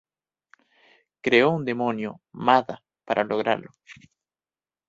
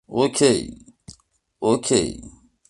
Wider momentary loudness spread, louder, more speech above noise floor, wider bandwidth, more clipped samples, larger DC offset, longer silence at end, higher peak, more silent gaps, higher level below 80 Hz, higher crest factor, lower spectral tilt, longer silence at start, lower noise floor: about the same, 14 LU vs 15 LU; second, -23 LUFS vs -20 LUFS; first, over 66 dB vs 40 dB; second, 7.8 kHz vs 11.5 kHz; neither; neither; first, 0.95 s vs 0.4 s; about the same, -4 dBFS vs -2 dBFS; neither; second, -68 dBFS vs -50 dBFS; about the same, 22 dB vs 20 dB; first, -6.5 dB/octave vs -4 dB/octave; first, 1.25 s vs 0.1 s; first, under -90 dBFS vs -59 dBFS